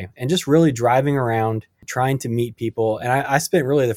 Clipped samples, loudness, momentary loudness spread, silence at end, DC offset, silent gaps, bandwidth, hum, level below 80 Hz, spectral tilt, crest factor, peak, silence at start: under 0.1%; -20 LUFS; 8 LU; 0 s; under 0.1%; none; 17 kHz; none; -54 dBFS; -6 dB/octave; 18 dB; -2 dBFS; 0 s